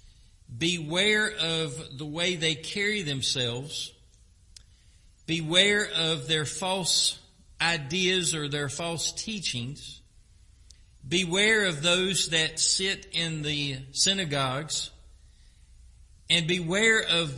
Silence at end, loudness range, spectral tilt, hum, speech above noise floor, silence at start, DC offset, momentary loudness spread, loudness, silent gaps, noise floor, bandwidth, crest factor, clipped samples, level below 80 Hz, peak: 0 s; 5 LU; -2.5 dB/octave; none; 30 dB; 0.05 s; under 0.1%; 12 LU; -25 LUFS; none; -57 dBFS; 11.5 kHz; 22 dB; under 0.1%; -56 dBFS; -6 dBFS